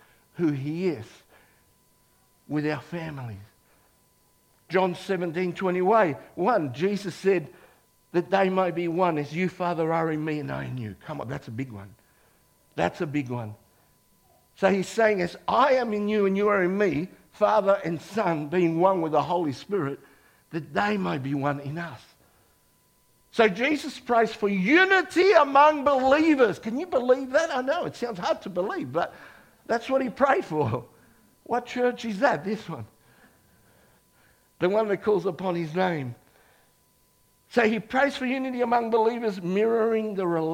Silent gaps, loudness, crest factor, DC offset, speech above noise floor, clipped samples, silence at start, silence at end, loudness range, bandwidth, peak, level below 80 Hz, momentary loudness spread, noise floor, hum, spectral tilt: none; -25 LUFS; 22 dB; under 0.1%; 39 dB; under 0.1%; 0.35 s; 0 s; 11 LU; 16.5 kHz; -4 dBFS; -64 dBFS; 14 LU; -64 dBFS; none; -6.5 dB/octave